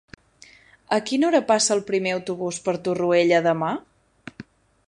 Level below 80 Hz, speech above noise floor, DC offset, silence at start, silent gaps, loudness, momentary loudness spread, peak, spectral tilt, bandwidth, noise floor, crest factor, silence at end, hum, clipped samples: -64 dBFS; 31 dB; under 0.1%; 0.9 s; none; -22 LUFS; 10 LU; -4 dBFS; -4 dB/octave; 11 kHz; -52 dBFS; 20 dB; 0.45 s; none; under 0.1%